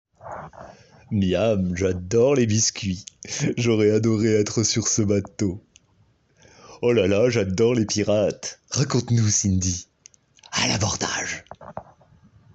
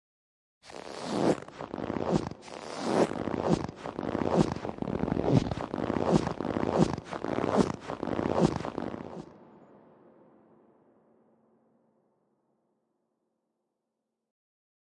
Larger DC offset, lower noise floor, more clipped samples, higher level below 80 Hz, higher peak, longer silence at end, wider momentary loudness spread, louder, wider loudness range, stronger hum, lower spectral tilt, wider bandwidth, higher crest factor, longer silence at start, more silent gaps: neither; second, -61 dBFS vs -85 dBFS; neither; about the same, -56 dBFS vs -54 dBFS; about the same, -8 dBFS vs -10 dBFS; second, 0.7 s vs 5.3 s; about the same, 15 LU vs 13 LU; first, -22 LUFS vs -31 LUFS; second, 2 LU vs 6 LU; neither; second, -4.5 dB/octave vs -7 dB/octave; second, 8.2 kHz vs 11.5 kHz; second, 16 dB vs 24 dB; second, 0.25 s vs 0.65 s; neither